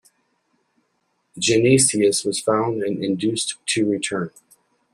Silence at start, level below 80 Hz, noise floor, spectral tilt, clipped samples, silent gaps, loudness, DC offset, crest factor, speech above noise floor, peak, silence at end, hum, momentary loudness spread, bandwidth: 1.35 s; -60 dBFS; -70 dBFS; -3.5 dB/octave; under 0.1%; none; -20 LUFS; under 0.1%; 18 dB; 50 dB; -4 dBFS; 0.65 s; none; 9 LU; 14 kHz